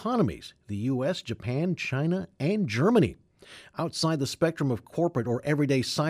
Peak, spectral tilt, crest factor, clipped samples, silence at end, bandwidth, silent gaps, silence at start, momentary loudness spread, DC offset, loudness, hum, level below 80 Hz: -10 dBFS; -6 dB/octave; 18 dB; under 0.1%; 0 s; 15.5 kHz; none; 0 s; 9 LU; under 0.1%; -28 LUFS; none; -58 dBFS